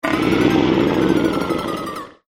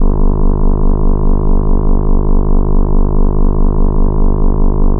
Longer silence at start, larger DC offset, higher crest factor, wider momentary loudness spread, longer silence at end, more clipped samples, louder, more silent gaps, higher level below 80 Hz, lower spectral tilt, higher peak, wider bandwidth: about the same, 0.05 s vs 0 s; neither; first, 16 dB vs 8 dB; first, 10 LU vs 0 LU; first, 0.2 s vs 0 s; neither; about the same, -18 LUFS vs -16 LUFS; neither; second, -40 dBFS vs -8 dBFS; second, -6 dB/octave vs -15 dB/octave; about the same, -2 dBFS vs 0 dBFS; first, 16 kHz vs 1.5 kHz